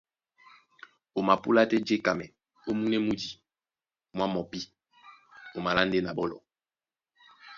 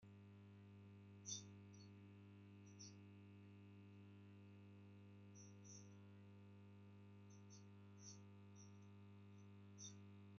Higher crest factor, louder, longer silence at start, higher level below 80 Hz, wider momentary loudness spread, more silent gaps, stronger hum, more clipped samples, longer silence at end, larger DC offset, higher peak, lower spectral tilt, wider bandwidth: about the same, 24 dB vs 24 dB; first, -28 LUFS vs -62 LUFS; first, 1.15 s vs 0 s; first, -62 dBFS vs under -90 dBFS; first, 19 LU vs 6 LU; neither; second, none vs 50 Hz at -65 dBFS; neither; about the same, 0 s vs 0 s; neither; first, -6 dBFS vs -38 dBFS; about the same, -5.5 dB/octave vs -5.5 dB/octave; about the same, 7.4 kHz vs 7.2 kHz